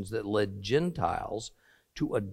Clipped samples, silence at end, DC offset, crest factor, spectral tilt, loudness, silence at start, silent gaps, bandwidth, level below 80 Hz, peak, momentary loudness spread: under 0.1%; 0 s; under 0.1%; 18 dB; -6 dB/octave; -31 LUFS; 0 s; none; 14.5 kHz; -56 dBFS; -14 dBFS; 11 LU